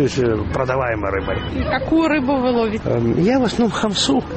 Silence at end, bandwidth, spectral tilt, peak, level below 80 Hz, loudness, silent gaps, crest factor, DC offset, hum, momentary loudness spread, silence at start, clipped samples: 0 s; 8.8 kHz; -5.5 dB/octave; -4 dBFS; -34 dBFS; -18 LUFS; none; 14 dB; under 0.1%; none; 5 LU; 0 s; under 0.1%